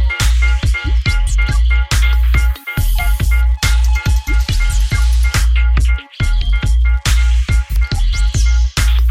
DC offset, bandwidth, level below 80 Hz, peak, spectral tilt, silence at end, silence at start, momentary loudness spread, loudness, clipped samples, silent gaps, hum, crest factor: under 0.1%; 15.5 kHz; -12 dBFS; -2 dBFS; -4 dB/octave; 0 s; 0 s; 3 LU; -15 LUFS; under 0.1%; none; none; 10 dB